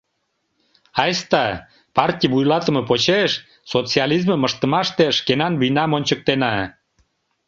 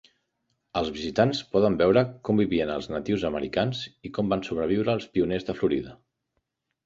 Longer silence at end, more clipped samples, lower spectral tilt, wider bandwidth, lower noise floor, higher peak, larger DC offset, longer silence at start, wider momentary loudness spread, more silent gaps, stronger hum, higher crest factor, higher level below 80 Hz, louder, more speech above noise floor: about the same, 0.8 s vs 0.9 s; neither; second, -5 dB/octave vs -7 dB/octave; about the same, 7.6 kHz vs 7.8 kHz; second, -72 dBFS vs -78 dBFS; first, -2 dBFS vs -6 dBFS; neither; first, 0.95 s vs 0.75 s; about the same, 7 LU vs 9 LU; neither; neither; about the same, 18 dB vs 20 dB; about the same, -54 dBFS vs -52 dBFS; first, -19 LUFS vs -26 LUFS; about the same, 53 dB vs 53 dB